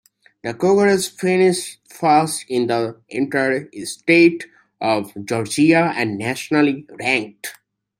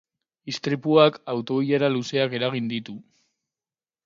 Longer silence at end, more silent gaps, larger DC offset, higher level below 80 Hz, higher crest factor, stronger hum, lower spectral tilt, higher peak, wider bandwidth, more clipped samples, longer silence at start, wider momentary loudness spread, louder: second, 0.45 s vs 1.05 s; neither; neither; first, -64 dBFS vs -70 dBFS; about the same, 18 dB vs 22 dB; neither; about the same, -5 dB/octave vs -6 dB/octave; about the same, -2 dBFS vs -2 dBFS; first, 16 kHz vs 7.6 kHz; neither; about the same, 0.45 s vs 0.45 s; about the same, 15 LU vs 17 LU; first, -18 LUFS vs -23 LUFS